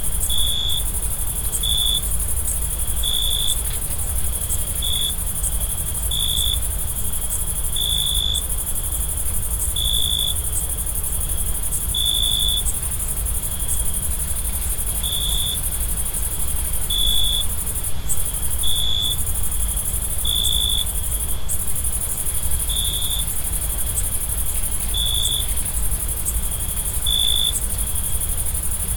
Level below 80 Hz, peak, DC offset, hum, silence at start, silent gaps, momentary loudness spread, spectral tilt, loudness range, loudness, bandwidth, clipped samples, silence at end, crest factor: -26 dBFS; -6 dBFS; under 0.1%; none; 0 s; none; 5 LU; -1.5 dB/octave; 1 LU; -20 LUFS; 19.5 kHz; under 0.1%; 0 s; 16 dB